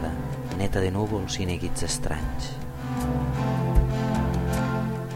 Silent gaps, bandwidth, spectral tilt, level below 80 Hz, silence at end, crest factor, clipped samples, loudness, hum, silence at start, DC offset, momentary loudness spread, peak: none; 16.5 kHz; -6 dB/octave; -32 dBFS; 0 s; 20 dB; under 0.1%; -27 LUFS; none; 0 s; under 0.1%; 8 LU; -6 dBFS